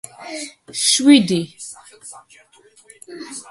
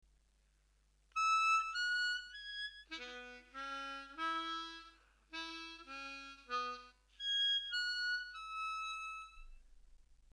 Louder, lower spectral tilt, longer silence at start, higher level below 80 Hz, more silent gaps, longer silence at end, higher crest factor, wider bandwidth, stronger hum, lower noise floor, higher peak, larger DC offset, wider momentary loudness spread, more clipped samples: first, -15 LUFS vs -39 LUFS; first, -3 dB/octave vs 0.5 dB/octave; second, 0.2 s vs 1.15 s; about the same, -64 dBFS vs -68 dBFS; neither; about the same, 0.1 s vs 0.2 s; about the same, 20 dB vs 18 dB; about the same, 11.5 kHz vs 11 kHz; neither; second, -52 dBFS vs -73 dBFS; first, 0 dBFS vs -24 dBFS; neither; first, 26 LU vs 16 LU; neither